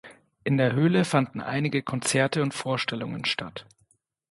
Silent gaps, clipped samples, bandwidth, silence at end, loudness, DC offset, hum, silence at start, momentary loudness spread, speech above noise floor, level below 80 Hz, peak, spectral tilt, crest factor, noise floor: none; under 0.1%; 11.5 kHz; 0.7 s; -26 LUFS; under 0.1%; none; 0.05 s; 9 LU; 42 dB; -66 dBFS; -8 dBFS; -5 dB/octave; 18 dB; -68 dBFS